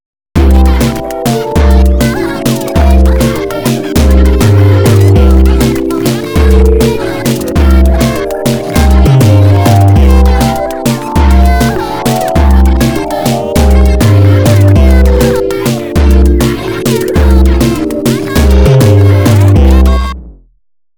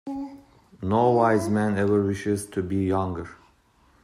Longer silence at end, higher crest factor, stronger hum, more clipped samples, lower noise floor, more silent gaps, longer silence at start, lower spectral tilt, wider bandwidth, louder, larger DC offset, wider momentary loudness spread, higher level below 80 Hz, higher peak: about the same, 0.65 s vs 0.7 s; second, 6 dB vs 16 dB; neither; first, 0.5% vs under 0.1%; second, -31 dBFS vs -60 dBFS; neither; first, 0.35 s vs 0.05 s; about the same, -6.5 dB/octave vs -7 dB/octave; first, over 20 kHz vs 14.5 kHz; first, -8 LUFS vs -24 LUFS; neither; second, 7 LU vs 15 LU; first, -10 dBFS vs -58 dBFS; first, 0 dBFS vs -8 dBFS